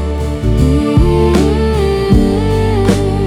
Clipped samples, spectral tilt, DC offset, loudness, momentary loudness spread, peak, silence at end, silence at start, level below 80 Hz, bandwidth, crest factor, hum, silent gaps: under 0.1%; -7.5 dB/octave; under 0.1%; -12 LUFS; 3 LU; 0 dBFS; 0 s; 0 s; -18 dBFS; 14 kHz; 10 dB; none; none